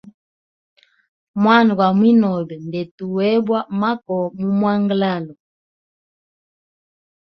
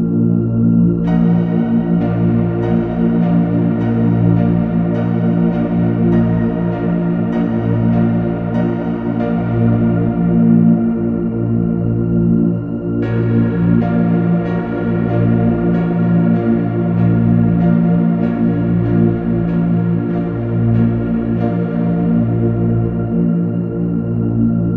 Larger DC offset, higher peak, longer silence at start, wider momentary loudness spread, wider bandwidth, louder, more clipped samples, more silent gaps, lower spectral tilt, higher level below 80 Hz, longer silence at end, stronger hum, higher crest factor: neither; about the same, -2 dBFS vs -2 dBFS; first, 1.35 s vs 0 s; first, 14 LU vs 4 LU; first, 6 kHz vs 3.8 kHz; second, -18 LUFS vs -15 LUFS; neither; first, 2.91-2.98 s vs none; second, -8.5 dB/octave vs -12 dB/octave; second, -64 dBFS vs -34 dBFS; first, 2.05 s vs 0 s; neither; first, 18 dB vs 12 dB